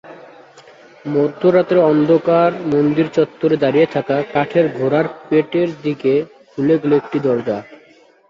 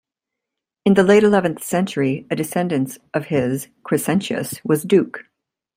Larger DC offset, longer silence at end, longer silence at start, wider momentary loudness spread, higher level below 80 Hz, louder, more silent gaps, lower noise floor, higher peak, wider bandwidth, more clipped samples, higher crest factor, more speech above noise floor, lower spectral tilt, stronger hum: neither; about the same, 0.55 s vs 0.55 s; second, 0.05 s vs 0.85 s; second, 7 LU vs 12 LU; about the same, -60 dBFS vs -60 dBFS; first, -16 LUFS vs -19 LUFS; neither; second, -49 dBFS vs -84 dBFS; about the same, -2 dBFS vs -2 dBFS; second, 7.4 kHz vs 16 kHz; neither; about the same, 14 dB vs 18 dB; second, 34 dB vs 65 dB; first, -8.5 dB/octave vs -6 dB/octave; neither